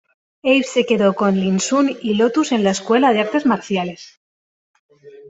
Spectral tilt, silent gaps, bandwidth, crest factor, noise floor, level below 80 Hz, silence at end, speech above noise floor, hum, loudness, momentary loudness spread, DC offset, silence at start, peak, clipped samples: -5 dB/octave; 4.17-4.89 s; 8.2 kHz; 16 dB; under -90 dBFS; -60 dBFS; 0 s; over 73 dB; none; -17 LUFS; 7 LU; under 0.1%; 0.45 s; -2 dBFS; under 0.1%